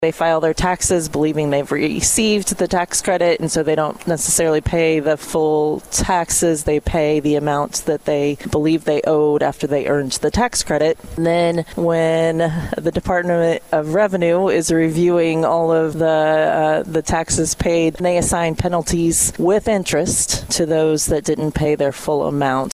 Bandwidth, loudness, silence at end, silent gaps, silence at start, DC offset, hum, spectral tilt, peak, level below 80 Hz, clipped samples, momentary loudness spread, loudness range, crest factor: 16 kHz; -17 LUFS; 0 s; none; 0 s; under 0.1%; none; -4.5 dB/octave; -2 dBFS; -36 dBFS; under 0.1%; 4 LU; 2 LU; 14 dB